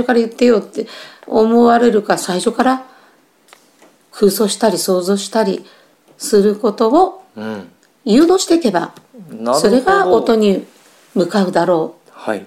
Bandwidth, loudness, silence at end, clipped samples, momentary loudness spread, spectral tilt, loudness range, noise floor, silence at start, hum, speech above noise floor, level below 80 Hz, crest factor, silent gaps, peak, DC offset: 16 kHz; -14 LUFS; 0 s; under 0.1%; 16 LU; -5 dB/octave; 3 LU; -51 dBFS; 0 s; none; 37 dB; -54 dBFS; 14 dB; none; 0 dBFS; under 0.1%